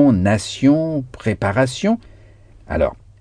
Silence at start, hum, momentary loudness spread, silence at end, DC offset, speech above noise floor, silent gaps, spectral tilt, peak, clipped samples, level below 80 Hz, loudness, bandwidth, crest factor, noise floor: 0 s; none; 8 LU; 0.25 s; under 0.1%; 27 dB; none; -6.5 dB/octave; -2 dBFS; under 0.1%; -38 dBFS; -19 LUFS; 10 kHz; 16 dB; -45 dBFS